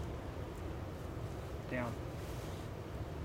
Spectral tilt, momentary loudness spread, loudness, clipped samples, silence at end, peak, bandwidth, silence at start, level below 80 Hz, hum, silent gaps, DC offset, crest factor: -6.5 dB/octave; 5 LU; -44 LUFS; under 0.1%; 0 s; -26 dBFS; 16 kHz; 0 s; -50 dBFS; none; none; under 0.1%; 18 dB